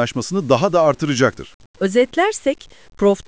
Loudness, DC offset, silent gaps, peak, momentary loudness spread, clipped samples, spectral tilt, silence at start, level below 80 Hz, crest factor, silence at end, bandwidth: -18 LUFS; 0.4%; 1.54-1.60 s, 1.66-1.74 s; -2 dBFS; 8 LU; under 0.1%; -5 dB/octave; 0 s; -50 dBFS; 16 dB; 0.05 s; 8 kHz